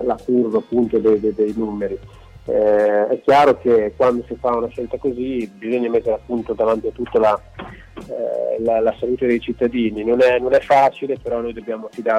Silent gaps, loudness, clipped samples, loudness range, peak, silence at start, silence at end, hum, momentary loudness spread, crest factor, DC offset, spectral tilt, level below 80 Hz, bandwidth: none; -18 LUFS; under 0.1%; 4 LU; -6 dBFS; 0 s; 0 s; none; 11 LU; 12 dB; under 0.1%; -7 dB/octave; -46 dBFS; 10.5 kHz